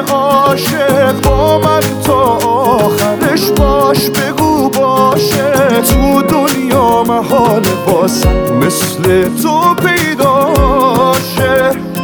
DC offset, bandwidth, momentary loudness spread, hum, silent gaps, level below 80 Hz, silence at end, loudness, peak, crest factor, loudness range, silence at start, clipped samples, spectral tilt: under 0.1%; over 20 kHz; 2 LU; none; none; -24 dBFS; 0 s; -10 LUFS; 0 dBFS; 10 dB; 1 LU; 0 s; under 0.1%; -5 dB/octave